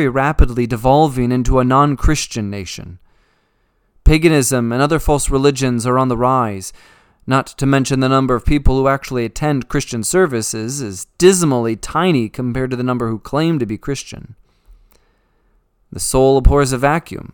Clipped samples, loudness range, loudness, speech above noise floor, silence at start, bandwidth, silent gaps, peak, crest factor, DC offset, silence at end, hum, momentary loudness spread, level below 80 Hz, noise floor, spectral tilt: under 0.1%; 4 LU; -16 LUFS; 46 dB; 0 s; 19 kHz; none; 0 dBFS; 16 dB; under 0.1%; 0.05 s; none; 11 LU; -24 dBFS; -62 dBFS; -5.5 dB/octave